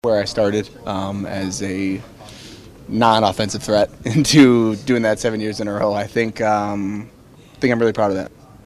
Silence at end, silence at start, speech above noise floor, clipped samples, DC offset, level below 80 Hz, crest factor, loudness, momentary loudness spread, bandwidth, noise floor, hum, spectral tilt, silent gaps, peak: 0.35 s; 0.05 s; 21 dB; under 0.1%; under 0.1%; -48 dBFS; 18 dB; -18 LUFS; 16 LU; 14.5 kHz; -39 dBFS; none; -5 dB/octave; none; 0 dBFS